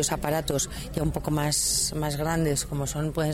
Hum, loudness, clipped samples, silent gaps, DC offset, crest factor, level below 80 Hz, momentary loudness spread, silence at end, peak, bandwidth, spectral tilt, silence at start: none; -26 LUFS; under 0.1%; none; under 0.1%; 14 dB; -40 dBFS; 6 LU; 0 s; -12 dBFS; 16.5 kHz; -4 dB/octave; 0 s